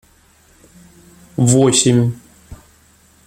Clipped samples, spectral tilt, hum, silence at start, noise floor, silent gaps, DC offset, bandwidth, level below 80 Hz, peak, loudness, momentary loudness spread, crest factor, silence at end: under 0.1%; -5 dB/octave; none; 1.4 s; -51 dBFS; none; under 0.1%; 15 kHz; -48 dBFS; 0 dBFS; -14 LUFS; 18 LU; 18 dB; 0.7 s